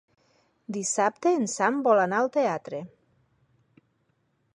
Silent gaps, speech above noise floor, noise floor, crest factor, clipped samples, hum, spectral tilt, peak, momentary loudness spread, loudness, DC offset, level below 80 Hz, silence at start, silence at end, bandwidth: none; 46 dB; -71 dBFS; 18 dB; under 0.1%; none; -4 dB/octave; -10 dBFS; 16 LU; -25 LUFS; under 0.1%; -78 dBFS; 0.7 s; 1.7 s; 11.5 kHz